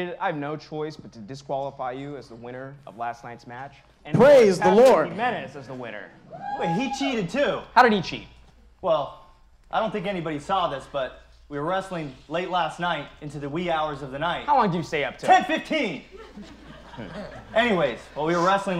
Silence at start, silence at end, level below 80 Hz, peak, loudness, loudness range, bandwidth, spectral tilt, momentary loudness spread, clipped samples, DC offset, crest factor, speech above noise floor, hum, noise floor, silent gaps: 0 s; 0 s; -54 dBFS; -4 dBFS; -23 LUFS; 9 LU; 14.5 kHz; -5.5 dB/octave; 21 LU; under 0.1%; under 0.1%; 22 dB; 29 dB; none; -52 dBFS; none